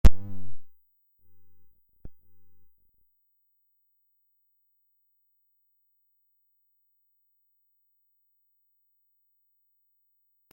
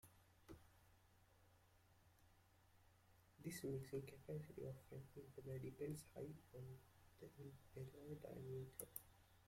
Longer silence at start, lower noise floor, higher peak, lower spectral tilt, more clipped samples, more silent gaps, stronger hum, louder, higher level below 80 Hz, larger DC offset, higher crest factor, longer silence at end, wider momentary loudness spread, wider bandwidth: about the same, 0.05 s vs 0.05 s; about the same, -72 dBFS vs -75 dBFS; first, -4 dBFS vs -30 dBFS; about the same, -7 dB/octave vs -6 dB/octave; neither; neither; first, 50 Hz at -90 dBFS vs none; first, -35 LUFS vs -55 LUFS; first, -36 dBFS vs -78 dBFS; neither; about the same, 24 dB vs 26 dB; first, 8.4 s vs 0 s; first, 22 LU vs 14 LU; about the same, 16.5 kHz vs 16.5 kHz